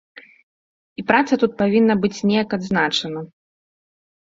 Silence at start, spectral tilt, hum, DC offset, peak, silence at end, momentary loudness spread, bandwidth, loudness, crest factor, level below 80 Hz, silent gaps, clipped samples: 1 s; -5.5 dB/octave; none; under 0.1%; 0 dBFS; 1 s; 15 LU; 7.8 kHz; -19 LUFS; 20 dB; -58 dBFS; none; under 0.1%